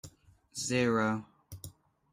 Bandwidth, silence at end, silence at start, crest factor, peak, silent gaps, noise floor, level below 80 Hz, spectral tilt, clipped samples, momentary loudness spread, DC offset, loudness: 16 kHz; 0.45 s; 0.05 s; 18 dB; -16 dBFS; none; -59 dBFS; -66 dBFS; -4.5 dB/octave; under 0.1%; 22 LU; under 0.1%; -31 LUFS